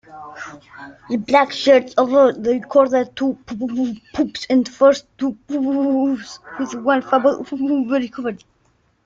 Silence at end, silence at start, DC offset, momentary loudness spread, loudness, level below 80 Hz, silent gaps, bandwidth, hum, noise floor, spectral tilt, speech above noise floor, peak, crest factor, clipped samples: 0.7 s; 0.1 s; under 0.1%; 19 LU; -18 LUFS; -58 dBFS; none; 7.6 kHz; none; -61 dBFS; -5 dB/octave; 43 dB; -2 dBFS; 18 dB; under 0.1%